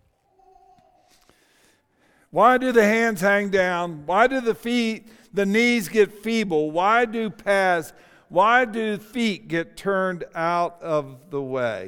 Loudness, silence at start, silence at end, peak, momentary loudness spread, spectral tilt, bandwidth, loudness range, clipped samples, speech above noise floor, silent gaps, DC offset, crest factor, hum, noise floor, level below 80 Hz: -22 LUFS; 2.35 s; 0 s; -4 dBFS; 10 LU; -5 dB/octave; 18 kHz; 3 LU; under 0.1%; 40 dB; none; under 0.1%; 20 dB; none; -62 dBFS; -58 dBFS